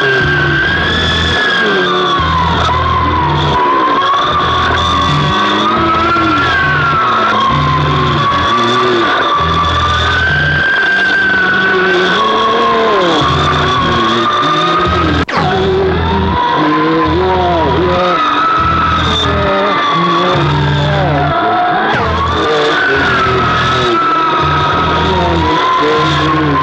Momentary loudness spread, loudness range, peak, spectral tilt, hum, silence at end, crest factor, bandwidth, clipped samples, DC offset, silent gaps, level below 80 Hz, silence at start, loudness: 2 LU; 1 LU; -2 dBFS; -5.5 dB/octave; none; 0 s; 10 dB; 9.2 kHz; under 0.1%; under 0.1%; none; -28 dBFS; 0 s; -10 LUFS